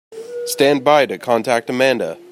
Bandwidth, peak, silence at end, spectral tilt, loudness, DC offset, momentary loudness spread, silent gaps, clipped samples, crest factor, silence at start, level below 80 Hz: 16 kHz; -2 dBFS; 0.15 s; -4 dB/octave; -16 LUFS; under 0.1%; 11 LU; none; under 0.1%; 16 dB; 0.1 s; -66 dBFS